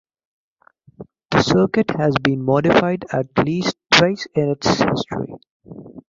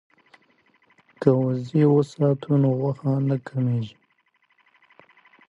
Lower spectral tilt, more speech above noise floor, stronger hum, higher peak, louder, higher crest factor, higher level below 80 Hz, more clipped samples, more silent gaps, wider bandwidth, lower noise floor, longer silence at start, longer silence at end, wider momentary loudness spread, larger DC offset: second, -5.5 dB/octave vs -9.5 dB/octave; second, 33 dB vs 45 dB; neither; about the same, 0 dBFS vs -2 dBFS; first, -18 LUFS vs -22 LUFS; about the same, 18 dB vs 22 dB; first, -48 dBFS vs -64 dBFS; neither; first, 5.51-5.60 s vs none; about the same, 7.6 kHz vs 7.8 kHz; second, -52 dBFS vs -67 dBFS; second, 1 s vs 1.2 s; second, 0.1 s vs 1.6 s; first, 11 LU vs 6 LU; neither